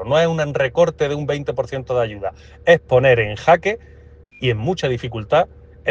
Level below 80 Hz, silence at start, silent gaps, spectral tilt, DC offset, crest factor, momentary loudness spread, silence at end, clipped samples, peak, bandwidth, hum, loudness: -44 dBFS; 0 s; none; -6 dB/octave; under 0.1%; 18 dB; 11 LU; 0 s; under 0.1%; 0 dBFS; 7.6 kHz; none; -18 LUFS